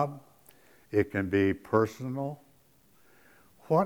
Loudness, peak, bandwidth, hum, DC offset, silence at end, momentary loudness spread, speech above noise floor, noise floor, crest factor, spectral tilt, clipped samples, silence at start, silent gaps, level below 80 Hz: -30 LUFS; -10 dBFS; over 20 kHz; none; under 0.1%; 0 s; 11 LU; 35 dB; -64 dBFS; 22 dB; -8 dB/octave; under 0.1%; 0 s; none; -66 dBFS